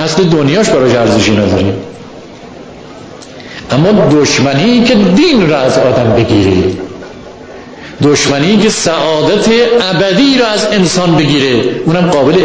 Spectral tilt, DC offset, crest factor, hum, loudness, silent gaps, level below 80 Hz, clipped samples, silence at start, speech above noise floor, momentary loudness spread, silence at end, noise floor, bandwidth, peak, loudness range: -5 dB/octave; under 0.1%; 10 dB; none; -9 LUFS; none; -36 dBFS; under 0.1%; 0 s; 21 dB; 22 LU; 0 s; -29 dBFS; 8 kHz; 0 dBFS; 4 LU